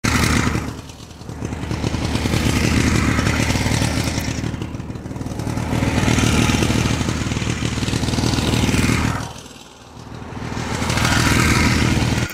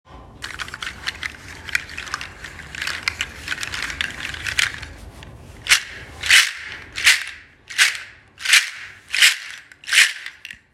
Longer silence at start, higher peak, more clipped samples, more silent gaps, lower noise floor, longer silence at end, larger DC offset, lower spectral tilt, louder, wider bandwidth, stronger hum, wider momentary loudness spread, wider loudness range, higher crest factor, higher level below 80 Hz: about the same, 0.05 s vs 0.1 s; about the same, -2 dBFS vs 0 dBFS; neither; neither; about the same, -40 dBFS vs -40 dBFS; second, 0 s vs 0.2 s; neither; first, -4.5 dB/octave vs 1 dB/octave; about the same, -19 LUFS vs -18 LUFS; about the same, 16 kHz vs 16.5 kHz; neither; second, 16 LU vs 20 LU; second, 2 LU vs 10 LU; about the same, 18 dB vs 22 dB; first, -30 dBFS vs -48 dBFS